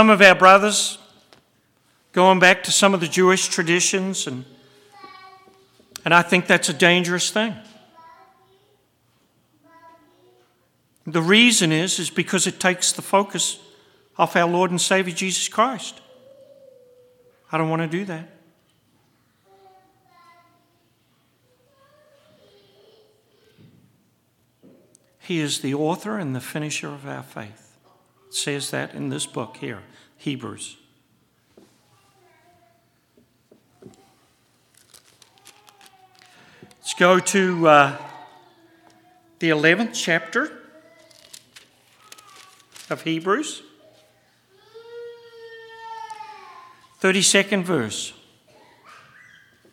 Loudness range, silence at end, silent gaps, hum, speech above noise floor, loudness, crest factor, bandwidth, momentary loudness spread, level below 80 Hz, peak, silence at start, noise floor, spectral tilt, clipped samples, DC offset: 14 LU; 1.6 s; none; none; 45 dB; -19 LUFS; 24 dB; 17 kHz; 23 LU; -72 dBFS; 0 dBFS; 0 s; -64 dBFS; -3 dB/octave; under 0.1%; under 0.1%